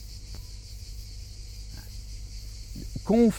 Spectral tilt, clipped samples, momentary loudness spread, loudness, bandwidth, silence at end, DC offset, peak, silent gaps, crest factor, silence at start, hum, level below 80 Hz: -6.5 dB/octave; under 0.1%; 12 LU; -35 LUFS; 17 kHz; 0 s; under 0.1%; -10 dBFS; none; 20 dB; 0 s; 50 Hz at -40 dBFS; -40 dBFS